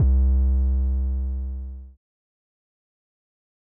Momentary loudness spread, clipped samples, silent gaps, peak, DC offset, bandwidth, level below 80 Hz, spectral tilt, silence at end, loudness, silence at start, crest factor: 16 LU; under 0.1%; none; -12 dBFS; under 0.1%; 1.3 kHz; -24 dBFS; -15 dB/octave; 1.8 s; -24 LUFS; 0 s; 12 dB